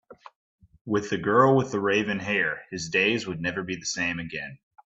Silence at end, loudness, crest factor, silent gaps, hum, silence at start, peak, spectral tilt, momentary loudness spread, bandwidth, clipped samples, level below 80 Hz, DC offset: 0.3 s; -25 LUFS; 20 dB; 0.36-0.58 s, 0.81-0.85 s; none; 0.1 s; -6 dBFS; -4.5 dB/octave; 13 LU; 8.2 kHz; under 0.1%; -62 dBFS; under 0.1%